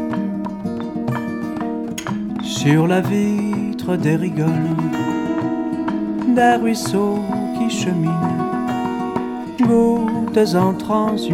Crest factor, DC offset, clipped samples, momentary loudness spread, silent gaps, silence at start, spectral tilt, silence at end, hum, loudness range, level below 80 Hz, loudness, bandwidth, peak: 16 dB; under 0.1%; under 0.1%; 9 LU; none; 0 s; -6.5 dB/octave; 0 s; none; 2 LU; -50 dBFS; -19 LUFS; 16 kHz; -2 dBFS